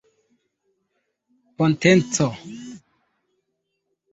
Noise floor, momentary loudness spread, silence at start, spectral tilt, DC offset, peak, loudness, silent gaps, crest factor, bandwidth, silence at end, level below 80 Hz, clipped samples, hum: -76 dBFS; 22 LU; 1.6 s; -5 dB/octave; under 0.1%; -2 dBFS; -19 LUFS; none; 24 dB; 8.2 kHz; 1.35 s; -60 dBFS; under 0.1%; none